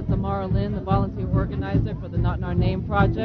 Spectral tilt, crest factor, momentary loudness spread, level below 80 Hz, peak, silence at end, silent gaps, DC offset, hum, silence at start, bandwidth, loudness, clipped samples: -10.5 dB/octave; 16 dB; 3 LU; -30 dBFS; -6 dBFS; 0 s; none; under 0.1%; none; 0 s; 5 kHz; -24 LUFS; under 0.1%